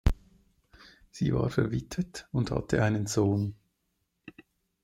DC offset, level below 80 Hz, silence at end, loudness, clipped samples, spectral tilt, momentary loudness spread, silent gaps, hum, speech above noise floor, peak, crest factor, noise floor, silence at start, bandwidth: under 0.1%; -40 dBFS; 0.55 s; -30 LUFS; under 0.1%; -6.5 dB/octave; 9 LU; none; none; 50 dB; -10 dBFS; 20 dB; -78 dBFS; 0.05 s; 16 kHz